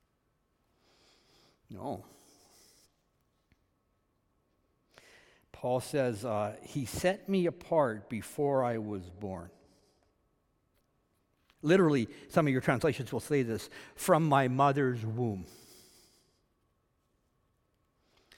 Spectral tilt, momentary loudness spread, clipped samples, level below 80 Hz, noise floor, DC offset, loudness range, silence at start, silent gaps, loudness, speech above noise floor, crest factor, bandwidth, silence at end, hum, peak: -6.5 dB/octave; 16 LU; under 0.1%; -68 dBFS; -76 dBFS; under 0.1%; 20 LU; 1.7 s; none; -31 LUFS; 45 dB; 24 dB; 18 kHz; 2.9 s; none; -10 dBFS